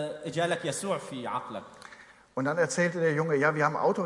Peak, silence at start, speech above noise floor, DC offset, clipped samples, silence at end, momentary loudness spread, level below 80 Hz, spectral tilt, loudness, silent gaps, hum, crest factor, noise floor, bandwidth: -10 dBFS; 0 s; 24 dB; under 0.1%; under 0.1%; 0 s; 16 LU; -72 dBFS; -5 dB/octave; -29 LUFS; none; none; 20 dB; -53 dBFS; 11.5 kHz